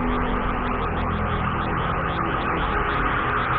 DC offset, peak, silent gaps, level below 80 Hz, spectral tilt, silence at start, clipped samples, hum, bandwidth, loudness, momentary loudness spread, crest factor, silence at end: under 0.1%; -12 dBFS; none; -32 dBFS; -9.5 dB/octave; 0 s; under 0.1%; none; 4.7 kHz; -24 LUFS; 3 LU; 12 dB; 0 s